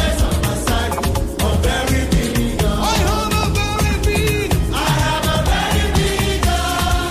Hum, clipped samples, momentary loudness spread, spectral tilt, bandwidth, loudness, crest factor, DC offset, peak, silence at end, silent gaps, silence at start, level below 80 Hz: none; under 0.1%; 2 LU; -4.5 dB/octave; 15.5 kHz; -17 LUFS; 14 dB; under 0.1%; -2 dBFS; 0 s; none; 0 s; -22 dBFS